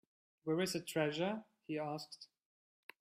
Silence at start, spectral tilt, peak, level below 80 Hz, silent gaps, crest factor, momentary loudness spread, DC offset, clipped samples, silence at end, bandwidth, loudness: 0.45 s; -5 dB/octave; -24 dBFS; -82 dBFS; none; 18 dB; 21 LU; under 0.1%; under 0.1%; 0.75 s; 15.5 kHz; -40 LUFS